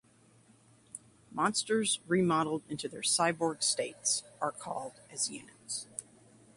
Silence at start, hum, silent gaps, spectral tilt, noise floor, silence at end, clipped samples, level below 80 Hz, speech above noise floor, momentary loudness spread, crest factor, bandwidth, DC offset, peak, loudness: 0.95 s; none; none; -3 dB/octave; -63 dBFS; 0.55 s; under 0.1%; -74 dBFS; 31 dB; 16 LU; 20 dB; 11.5 kHz; under 0.1%; -14 dBFS; -32 LUFS